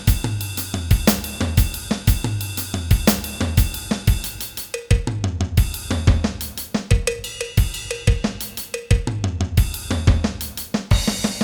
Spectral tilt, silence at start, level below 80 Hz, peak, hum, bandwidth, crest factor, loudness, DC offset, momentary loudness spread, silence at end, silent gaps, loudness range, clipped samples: -5 dB/octave; 0 s; -24 dBFS; 0 dBFS; none; over 20 kHz; 20 dB; -22 LUFS; under 0.1%; 8 LU; 0 s; none; 2 LU; under 0.1%